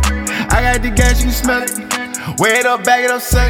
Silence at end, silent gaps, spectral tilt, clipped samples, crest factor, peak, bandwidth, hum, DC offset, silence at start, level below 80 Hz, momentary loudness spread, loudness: 0 s; none; -4 dB/octave; under 0.1%; 14 dB; 0 dBFS; 19 kHz; none; under 0.1%; 0 s; -18 dBFS; 7 LU; -14 LUFS